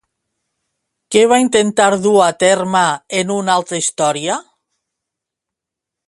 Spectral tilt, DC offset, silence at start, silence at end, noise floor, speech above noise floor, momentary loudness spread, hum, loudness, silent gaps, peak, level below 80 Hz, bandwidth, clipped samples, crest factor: -3.5 dB/octave; under 0.1%; 1.1 s; 1.65 s; -83 dBFS; 69 dB; 7 LU; none; -14 LUFS; none; 0 dBFS; -60 dBFS; 11.5 kHz; under 0.1%; 16 dB